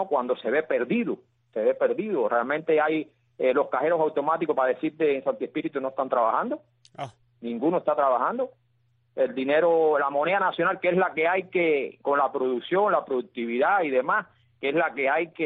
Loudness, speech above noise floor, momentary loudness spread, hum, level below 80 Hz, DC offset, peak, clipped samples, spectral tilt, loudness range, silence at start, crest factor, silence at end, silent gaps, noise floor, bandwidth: -25 LUFS; 43 dB; 9 LU; none; -78 dBFS; under 0.1%; -10 dBFS; under 0.1%; -8 dB/octave; 4 LU; 0 s; 16 dB; 0 s; none; -68 dBFS; 4.4 kHz